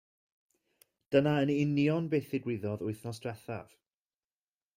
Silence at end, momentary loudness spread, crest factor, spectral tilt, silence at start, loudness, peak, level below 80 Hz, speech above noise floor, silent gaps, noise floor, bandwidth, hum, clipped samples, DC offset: 1.15 s; 13 LU; 22 dB; -7.5 dB/octave; 1.1 s; -32 LUFS; -12 dBFS; -70 dBFS; over 59 dB; none; under -90 dBFS; 16 kHz; none; under 0.1%; under 0.1%